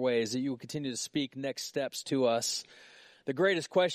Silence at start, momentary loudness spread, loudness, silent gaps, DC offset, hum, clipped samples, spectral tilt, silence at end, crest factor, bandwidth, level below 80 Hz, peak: 0 s; 9 LU; -32 LUFS; none; under 0.1%; none; under 0.1%; -3.5 dB/octave; 0 s; 18 dB; 15 kHz; -76 dBFS; -14 dBFS